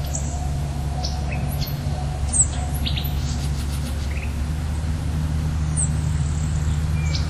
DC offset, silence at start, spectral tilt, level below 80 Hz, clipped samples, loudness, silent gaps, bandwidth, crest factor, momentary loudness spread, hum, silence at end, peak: under 0.1%; 0 s; -4.5 dB/octave; -26 dBFS; under 0.1%; -24 LUFS; none; 13 kHz; 18 dB; 6 LU; none; 0 s; -4 dBFS